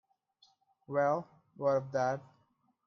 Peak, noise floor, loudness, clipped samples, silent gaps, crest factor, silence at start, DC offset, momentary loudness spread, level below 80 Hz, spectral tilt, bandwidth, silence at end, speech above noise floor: -18 dBFS; -74 dBFS; -34 LUFS; under 0.1%; none; 18 dB; 0.9 s; under 0.1%; 8 LU; -80 dBFS; -7 dB/octave; 6.6 kHz; 0.65 s; 42 dB